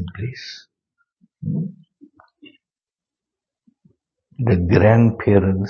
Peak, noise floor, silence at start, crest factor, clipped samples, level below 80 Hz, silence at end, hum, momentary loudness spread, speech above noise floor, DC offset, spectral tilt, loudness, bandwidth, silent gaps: 0 dBFS; under -90 dBFS; 0 s; 20 dB; under 0.1%; -46 dBFS; 0 s; none; 20 LU; over 74 dB; under 0.1%; -9 dB/octave; -18 LUFS; 6.6 kHz; none